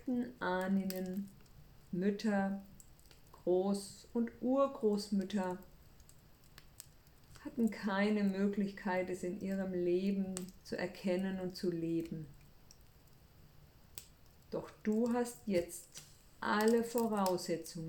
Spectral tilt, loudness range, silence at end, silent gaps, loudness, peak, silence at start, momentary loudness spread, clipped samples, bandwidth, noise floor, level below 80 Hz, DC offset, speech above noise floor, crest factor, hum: -6 dB/octave; 6 LU; 0 s; none; -37 LUFS; -18 dBFS; 0 s; 15 LU; under 0.1%; 19 kHz; -62 dBFS; -66 dBFS; under 0.1%; 26 dB; 20 dB; none